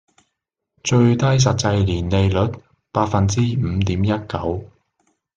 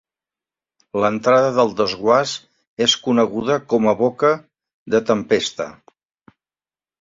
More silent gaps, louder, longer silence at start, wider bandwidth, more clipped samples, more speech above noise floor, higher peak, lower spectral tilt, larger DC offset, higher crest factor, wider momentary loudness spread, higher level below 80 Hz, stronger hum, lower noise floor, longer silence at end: second, none vs 2.67-2.77 s, 4.74-4.86 s; about the same, -19 LUFS vs -18 LUFS; about the same, 0.85 s vs 0.95 s; first, 9 kHz vs 7.8 kHz; neither; second, 61 dB vs over 72 dB; about the same, -2 dBFS vs -2 dBFS; first, -6 dB/octave vs -4 dB/octave; neither; about the same, 18 dB vs 18 dB; about the same, 10 LU vs 11 LU; first, -48 dBFS vs -60 dBFS; neither; second, -78 dBFS vs under -90 dBFS; second, 0.7 s vs 1.3 s